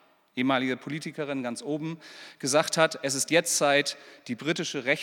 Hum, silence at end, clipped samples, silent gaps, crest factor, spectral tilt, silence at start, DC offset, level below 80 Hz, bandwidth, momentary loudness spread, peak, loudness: none; 0 s; under 0.1%; none; 22 dB; -3 dB/octave; 0.35 s; under 0.1%; -84 dBFS; 18.5 kHz; 15 LU; -6 dBFS; -27 LUFS